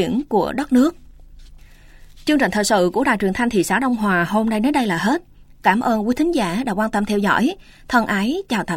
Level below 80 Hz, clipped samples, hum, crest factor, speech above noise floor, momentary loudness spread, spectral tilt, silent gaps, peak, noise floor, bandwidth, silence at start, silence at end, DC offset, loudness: -44 dBFS; under 0.1%; none; 16 dB; 25 dB; 4 LU; -5 dB/octave; none; -4 dBFS; -43 dBFS; 16.5 kHz; 0 s; 0 s; under 0.1%; -19 LUFS